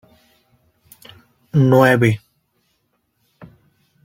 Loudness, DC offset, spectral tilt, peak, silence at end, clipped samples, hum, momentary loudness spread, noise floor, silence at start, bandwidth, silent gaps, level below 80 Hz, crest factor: -15 LUFS; under 0.1%; -7.5 dB/octave; -2 dBFS; 1.9 s; under 0.1%; none; 10 LU; -68 dBFS; 1.55 s; 16.5 kHz; none; -56 dBFS; 18 dB